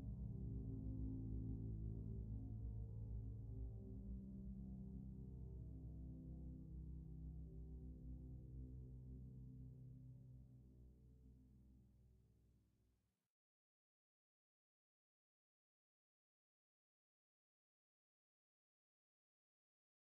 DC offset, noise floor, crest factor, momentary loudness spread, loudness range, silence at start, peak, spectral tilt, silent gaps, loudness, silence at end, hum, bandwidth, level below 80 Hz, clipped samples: under 0.1%; -85 dBFS; 16 dB; 13 LU; 12 LU; 0 s; -38 dBFS; -14.5 dB/octave; none; -54 LUFS; 7.55 s; none; 1.2 kHz; -58 dBFS; under 0.1%